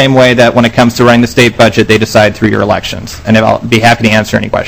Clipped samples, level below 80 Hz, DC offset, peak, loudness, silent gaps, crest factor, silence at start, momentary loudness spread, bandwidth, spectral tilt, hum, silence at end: 7%; -32 dBFS; 0.7%; 0 dBFS; -7 LUFS; none; 8 dB; 0 s; 6 LU; 17 kHz; -5.5 dB/octave; none; 0 s